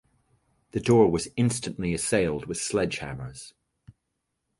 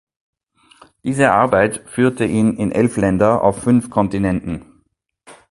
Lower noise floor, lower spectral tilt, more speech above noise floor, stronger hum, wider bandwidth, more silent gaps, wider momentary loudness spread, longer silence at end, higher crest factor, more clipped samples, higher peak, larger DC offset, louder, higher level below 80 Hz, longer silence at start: first, -80 dBFS vs -64 dBFS; second, -5 dB/octave vs -6.5 dB/octave; first, 55 dB vs 48 dB; neither; about the same, 11.5 kHz vs 11.5 kHz; neither; first, 17 LU vs 10 LU; first, 1.1 s vs 0.15 s; about the same, 20 dB vs 18 dB; neither; second, -8 dBFS vs 0 dBFS; neither; second, -26 LUFS vs -16 LUFS; second, -50 dBFS vs -44 dBFS; second, 0.75 s vs 1.05 s